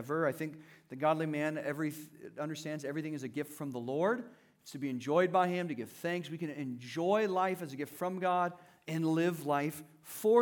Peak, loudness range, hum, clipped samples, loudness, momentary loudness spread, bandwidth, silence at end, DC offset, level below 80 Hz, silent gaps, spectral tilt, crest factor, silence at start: -14 dBFS; 4 LU; none; under 0.1%; -35 LUFS; 12 LU; 19 kHz; 0 s; under 0.1%; -88 dBFS; none; -6 dB/octave; 20 dB; 0 s